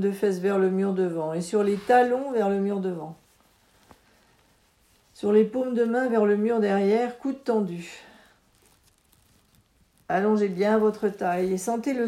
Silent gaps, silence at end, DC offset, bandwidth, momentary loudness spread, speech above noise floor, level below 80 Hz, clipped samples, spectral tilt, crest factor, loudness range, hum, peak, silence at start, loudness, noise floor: none; 0 s; under 0.1%; 14 kHz; 9 LU; 39 dB; -68 dBFS; under 0.1%; -6.5 dB/octave; 18 dB; 6 LU; none; -8 dBFS; 0 s; -24 LUFS; -63 dBFS